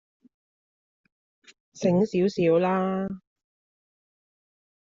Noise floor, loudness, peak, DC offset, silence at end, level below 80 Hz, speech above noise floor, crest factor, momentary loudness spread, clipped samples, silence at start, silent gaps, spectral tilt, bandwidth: under -90 dBFS; -24 LUFS; -12 dBFS; under 0.1%; 1.75 s; -68 dBFS; over 67 dB; 16 dB; 11 LU; under 0.1%; 1.75 s; none; -7 dB/octave; 7.6 kHz